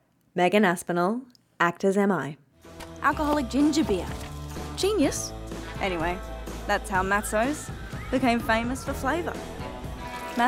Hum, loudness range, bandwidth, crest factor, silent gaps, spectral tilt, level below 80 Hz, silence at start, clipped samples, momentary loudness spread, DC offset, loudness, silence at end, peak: none; 3 LU; 16.5 kHz; 20 dB; none; -5 dB/octave; -42 dBFS; 0.35 s; under 0.1%; 14 LU; under 0.1%; -26 LUFS; 0 s; -8 dBFS